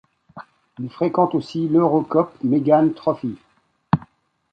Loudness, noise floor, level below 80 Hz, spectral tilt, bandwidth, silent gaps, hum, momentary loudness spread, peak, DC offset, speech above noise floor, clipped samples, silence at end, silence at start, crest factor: -20 LUFS; -51 dBFS; -58 dBFS; -9.5 dB/octave; 7.6 kHz; none; none; 13 LU; -2 dBFS; under 0.1%; 32 dB; under 0.1%; 0.55 s; 0.35 s; 18 dB